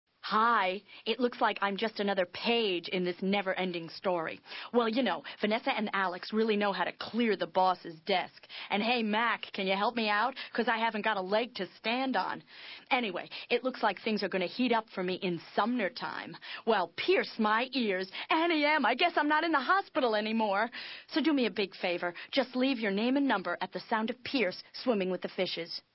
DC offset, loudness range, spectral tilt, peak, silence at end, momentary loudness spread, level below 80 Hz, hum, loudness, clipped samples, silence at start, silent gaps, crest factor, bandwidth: under 0.1%; 4 LU; -8.5 dB/octave; -14 dBFS; 0.15 s; 8 LU; -80 dBFS; none; -31 LUFS; under 0.1%; 0.25 s; none; 18 dB; 5.8 kHz